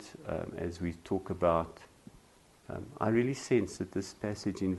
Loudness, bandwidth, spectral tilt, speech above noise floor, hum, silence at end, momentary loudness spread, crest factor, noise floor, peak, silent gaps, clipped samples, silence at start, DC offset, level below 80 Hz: -34 LUFS; 12 kHz; -6.5 dB/octave; 29 dB; none; 0 s; 14 LU; 20 dB; -62 dBFS; -14 dBFS; none; under 0.1%; 0 s; under 0.1%; -58 dBFS